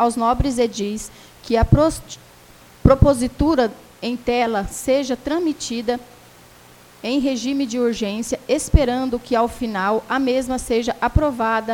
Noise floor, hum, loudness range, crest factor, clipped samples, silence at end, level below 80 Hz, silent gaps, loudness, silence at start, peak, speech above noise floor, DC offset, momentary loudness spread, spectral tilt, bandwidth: -47 dBFS; none; 4 LU; 20 dB; under 0.1%; 0 s; -30 dBFS; none; -20 LUFS; 0 s; 0 dBFS; 27 dB; under 0.1%; 10 LU; -6 dB/octave; 18 kHz